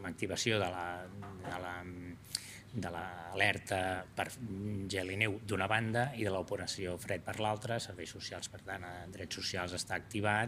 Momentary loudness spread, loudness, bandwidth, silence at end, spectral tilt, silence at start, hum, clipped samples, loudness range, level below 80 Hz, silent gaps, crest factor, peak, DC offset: 12 LU; -37 LUFS; 15.5 kHz; 0 s; -4 dB/octave; 0 s; none; under 0.1%; 4 LU; -66 dBFS; none; 24 dB; -14 dBFS; under 0.1%